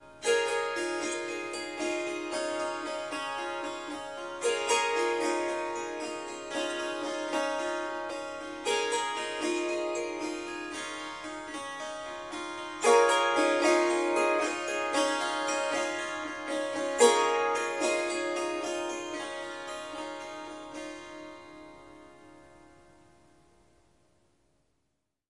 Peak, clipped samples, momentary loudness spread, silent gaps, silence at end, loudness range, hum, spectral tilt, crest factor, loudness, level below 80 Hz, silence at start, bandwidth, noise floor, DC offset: -8 dBFS; under 0.1%; 14 LU; none; 2.85 s; 13 LU; none; -1.5 dB/octave; 22 dB; -30 LUFS; -70 dBFS; 0 s; 11.5 kHz; -80 dBFS; under 0.1%